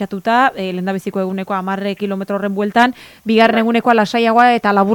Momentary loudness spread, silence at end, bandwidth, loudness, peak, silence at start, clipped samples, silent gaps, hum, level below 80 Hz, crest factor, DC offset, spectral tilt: 9 LU; 0 s; 17.5 kHz; -15 LUFS; 0 dBFS; 0 s; under 0.1%; none; none; -60 dBFS; 14 dB; under 0.1%; -6 dB/octave